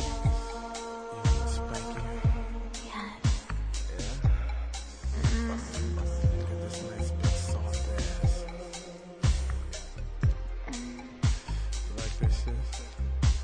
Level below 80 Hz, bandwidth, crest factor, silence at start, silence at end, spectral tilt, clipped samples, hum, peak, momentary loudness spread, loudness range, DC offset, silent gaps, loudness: -32 dBFS; 10 kHz; 16 dB; 0 s; 0 s; -5.5 dB/octave; under 0.1%; none; -14 dBFS; 9 LU; 2 LU; under 0.1%; none; -32 LUFS